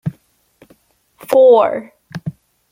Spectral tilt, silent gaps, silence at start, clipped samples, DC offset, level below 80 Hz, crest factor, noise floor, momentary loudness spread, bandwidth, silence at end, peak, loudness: -7 dB/octave; none; 0.05 s; under 0.1%; under 0.1%; -60 dBFS; 14 dB; -55 dBFS; 21 LU; 16 kHz; 0.4 s; -2 dBFS; -12 LUFS